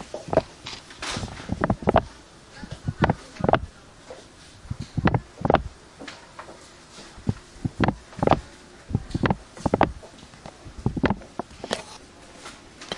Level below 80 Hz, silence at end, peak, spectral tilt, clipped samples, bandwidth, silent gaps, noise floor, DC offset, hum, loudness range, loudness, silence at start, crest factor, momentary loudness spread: -42 dBFS; 0 s; -2 dBFS; -6 dB/octave; under 0.1%; 11.5 kHz; none; -47 dBFS; under 0.1%; none; 3 LU; -27 LUFS; 0 s; 26 dB; 21 LU